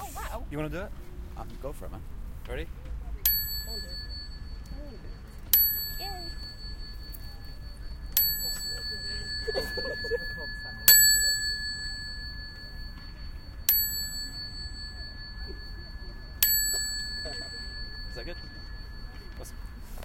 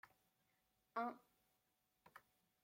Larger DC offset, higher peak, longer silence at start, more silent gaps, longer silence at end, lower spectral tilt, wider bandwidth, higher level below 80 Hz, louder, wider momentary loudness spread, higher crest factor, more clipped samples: neither; first, 0 dBFS vs -32 dBFS; about the same, 0 s vs 0.05 s; neither; second, 0 s vs 0.45 s; second, -1 dB/octave vs -5 dB/octave; about the same, 16.5 kHz vs 16.5 kHz; first, -40 dBFS vs under -90 dBFS; first, -26 LUFS vs -49 LUFS; about the same, 21 LU vs 20 LU; first, 32 dB vs 24 dB; neither